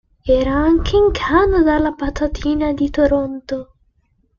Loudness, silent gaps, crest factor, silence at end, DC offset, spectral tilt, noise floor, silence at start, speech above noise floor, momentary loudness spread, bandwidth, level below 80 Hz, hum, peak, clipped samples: -16 LUFS; none; 14 dB; 0.75 s; under 0.1%; -7 dB/octave; -61 dBFS; 0.25 s; 45 dB; 9 LU; 7.2 kHz; -28 dBFS; none; -2 dBFS; under 0.1%